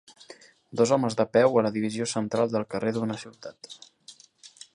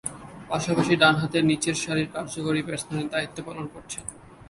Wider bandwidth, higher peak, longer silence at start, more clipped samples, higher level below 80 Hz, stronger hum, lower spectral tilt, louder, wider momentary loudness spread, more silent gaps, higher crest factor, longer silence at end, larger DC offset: about the same, 11 kHz vs 11.5 kHz; second, -8 dBFS vs -4 dBFS; first, 0.3 s vs 0.05 s; neither; second, -68 dBFS vs -56 dBFS; neither; about the same, -5.5 dB/octave vs -4.5 dB/octave; about the same, -26 LUFS vs -25 LUFS; first, 22 LU vs 16 LU; neither; about the same, 20 dB vs 22 dB; first, 0.25 s vs 0 s; neither